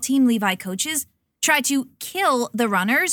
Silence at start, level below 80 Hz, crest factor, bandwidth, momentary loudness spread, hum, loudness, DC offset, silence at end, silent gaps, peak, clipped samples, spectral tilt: 0 s; -68 dBFS; 18 dB; 19 kHz; 7 LU; none; -21 LUFS; under 0.1%; 0 s; none; -4 dBFS; under 0.1%; -2.5 dB/octave